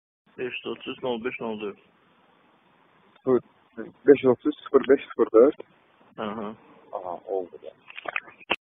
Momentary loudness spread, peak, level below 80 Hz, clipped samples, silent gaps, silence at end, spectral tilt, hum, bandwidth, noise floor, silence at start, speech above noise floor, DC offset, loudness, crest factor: 21 LU; -4 dBFS; -68 dBFS; under 0.1%; none; 0.15 s; -2 dB/octave; none; 3.9 kHz; -61 dBFS; 0.4 s; 36 dB; under 0.1%; -25 LUFS; 24 dB